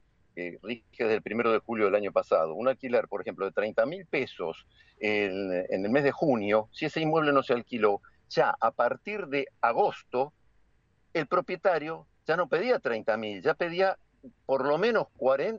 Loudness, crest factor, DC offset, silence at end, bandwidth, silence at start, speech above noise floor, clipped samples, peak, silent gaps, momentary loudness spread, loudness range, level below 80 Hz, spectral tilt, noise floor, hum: -28 LUFS; 18 dB; under 0.1%; 0 s; 7.4 kHz; 0.35 s; 38 dB; under 0.1%; -10 dBFS; none; 10 LU; 3 LU; -68 dBFS; -6.5 dB/octave; -66 dBFS; none